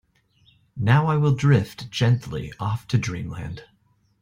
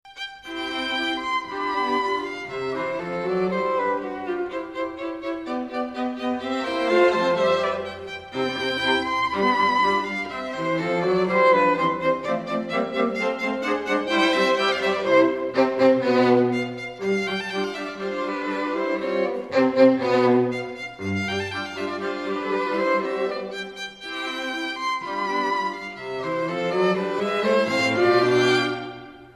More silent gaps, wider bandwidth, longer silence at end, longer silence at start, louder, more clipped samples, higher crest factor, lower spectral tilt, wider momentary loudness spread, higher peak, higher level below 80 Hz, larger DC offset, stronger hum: neither; first, 15.5 kHz vs 12.5 kHz; first, 0.6 s vs 0.05 s; first, 0.75 s vs 0.05 s; about the same, -23 LUFS vs -23 LUFS; neither; about the same, 18 dB vs 18 dB; first, -7 dB/octave vs -5 dB/octave; first, 16 LU vs 11 LU; about the same, -6 dBFS vs -6 dBFS; first, -50 dBFS vs -60 dBFS; neither; neither